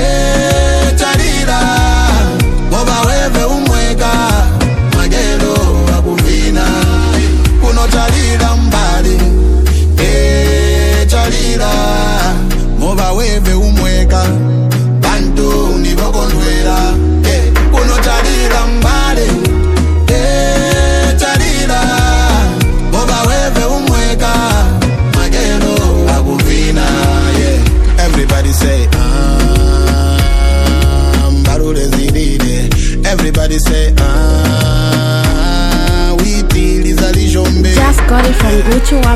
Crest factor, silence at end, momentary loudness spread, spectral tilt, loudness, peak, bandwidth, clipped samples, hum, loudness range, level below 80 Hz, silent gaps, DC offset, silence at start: 8 dB; 0 s; 3 LU; -5 dB/octave; -11 LUFS; 0 dBFS; 15.5 kHz; under 0.1%; none; 1 LU; -10 dBFS; none; under 0.1%; 0 s